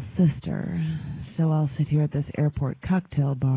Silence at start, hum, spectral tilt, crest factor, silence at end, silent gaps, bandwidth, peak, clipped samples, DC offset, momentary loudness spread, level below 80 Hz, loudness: 0 s; none; -13 dB/octave; 14 dB; 0 s; none; 4 kHz; -10 dBFS; under 0.1%; under 0.1%; 7 LU; -46 dBFS; -26 LUFS